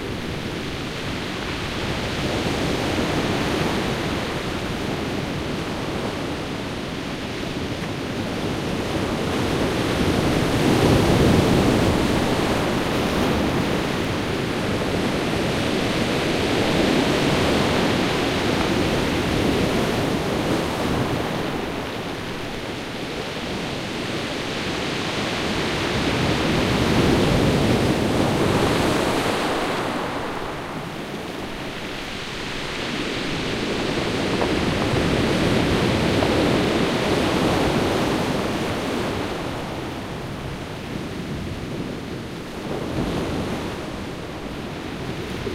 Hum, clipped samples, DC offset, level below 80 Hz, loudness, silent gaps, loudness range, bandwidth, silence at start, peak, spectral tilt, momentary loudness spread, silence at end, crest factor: none; under 0.1%; under 0.1%; -38 dBFS; -23 LUFS; none; 9 LU; 16 kHz; 0 s; -4 dBFS; -5 dB/octave; 10 LU; 0 s; 20 dB